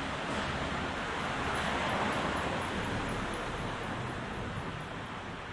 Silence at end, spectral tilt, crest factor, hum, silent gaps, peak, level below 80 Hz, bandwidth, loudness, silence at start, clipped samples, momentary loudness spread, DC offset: 0 s; -4.5 dB/octave; 16 dB; none; none; -20 dBFS; -48 dBFS; 11.5 kHz; -35 LUFS; 0 s; under 0.1%; 8 LU; under 0.1%